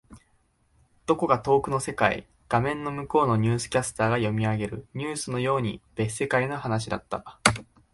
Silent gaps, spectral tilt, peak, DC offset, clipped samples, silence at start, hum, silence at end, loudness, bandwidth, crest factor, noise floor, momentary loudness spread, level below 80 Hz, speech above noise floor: none; -5 dB/octave; -2 dBFS; under 0.1%; under 0.1%; 0.1 s; none; 0.3 s; -26 LUFS; 11.5 kHz; 26 dB; -66 dBFS; 9 LU; -52 dBFS; 41 dB